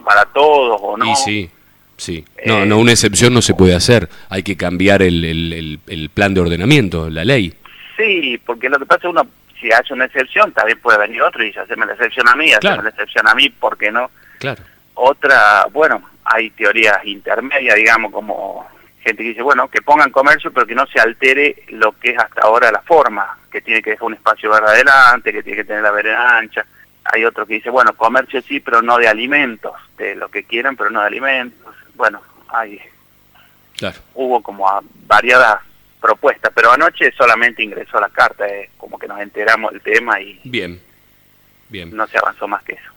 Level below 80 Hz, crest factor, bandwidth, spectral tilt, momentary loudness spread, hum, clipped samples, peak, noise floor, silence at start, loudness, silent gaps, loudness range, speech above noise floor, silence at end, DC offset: -44 dBFS; 14 dB; over 20 kHz; -4 dB/octave; 15 LU; none; under 0.1%; 0 dBFS; -51 dBFS; 0.05 s; -13 LUFS; none; 7 LU; 37 dB; 0.2 s; under 0.1%